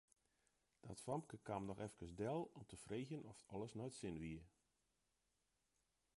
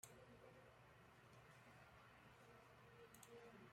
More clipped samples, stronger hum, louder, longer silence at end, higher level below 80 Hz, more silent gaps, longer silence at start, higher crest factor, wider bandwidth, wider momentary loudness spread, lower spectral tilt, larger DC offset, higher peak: neither; neither; first, -51 LUFS vs -66 LUFS; first, 1.7 s vs 0 s; first, -72 dBFS vs -82 dBFS; neither; first, 0.85 s vs 0 s; second, 20 dB vs 26 dB; second, 11.5 kHz vs 16 kHz; first, 9 LU vs 5 LU; first, -6 dB/octave vs -4 dB/octave; neither; first, -32 dBFS vs -40 dBFS